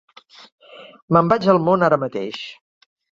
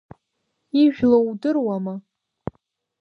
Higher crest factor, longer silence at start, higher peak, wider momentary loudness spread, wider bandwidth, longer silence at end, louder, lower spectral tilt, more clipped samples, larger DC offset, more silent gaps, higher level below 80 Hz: about the same, 20 dB vs 18 dB; about the same, 0.8 s vs 0.75 s; about the same, -2 dBFS vs -4 dBFS; second, 15 LU vs 19 LU; first, 7.4 kHz vs 5.4 kHz; second, 0.6 s vs 1 s; about the same, -18 LUFS vs -20 LUFS; about the same, -7.5 dB/octave vs -8.5 dB/octave; neither; neither; first, 1.02-1.08 s vs none; about the same, -58 dBFS vs -58 dBFS